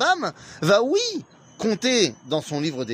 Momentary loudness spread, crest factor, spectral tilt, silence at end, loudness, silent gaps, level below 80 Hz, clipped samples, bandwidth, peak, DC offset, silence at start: 9 LU; 18 dB; -3.5 dB/octave; 0 s; -22 LUFS; none; -66 dBFS; under 0.1%; 15.5 kHz; -4 dBFS; under 0.1%; 0 s